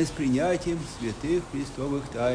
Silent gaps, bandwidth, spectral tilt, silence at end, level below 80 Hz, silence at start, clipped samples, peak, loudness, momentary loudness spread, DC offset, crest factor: none; 10.5 kHz; -6 dB/octave; 0 s; -46 dBFS; 0 s; under 0.1%; -14 dBFS; -28 LUFS; 7 LU; under 0.1%; 14 dB